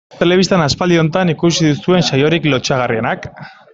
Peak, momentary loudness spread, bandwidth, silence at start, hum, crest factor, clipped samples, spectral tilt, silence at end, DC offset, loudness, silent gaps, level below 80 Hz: -2 dBFS; 6 LU; 7.8 kHz; 0.15 s; none; 12 dB; under 0.1%; -5 dB/octave; 0.25 s; under 0.1%; -14 LUFS; none; -44 dBFS